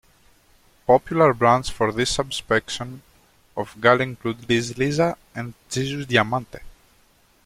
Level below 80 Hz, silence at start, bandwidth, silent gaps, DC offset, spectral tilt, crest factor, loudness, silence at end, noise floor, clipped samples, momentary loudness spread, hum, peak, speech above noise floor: -48 dBFS; 0.9 s; 16 kHz; none; under 0.1%; -4.5 dB/octave; 22 dB; -21 LUFS; 0.75 s; -58 dBFS; under 0.1%; 14 LU; none; -2 dBFS; 37 dB